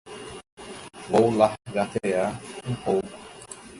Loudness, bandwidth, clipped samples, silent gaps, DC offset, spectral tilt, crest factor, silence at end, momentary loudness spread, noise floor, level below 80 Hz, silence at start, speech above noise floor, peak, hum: -25 LUFS; 11.5 kHz; under 0.1%; 0.52-0.57 s; under 0.1%; -6 dB/octave; 22 dB; 0 s; 20 LU; -43 dBFS; -56 dBFS; 0.05 s; 19 dB; -4 dBFS; none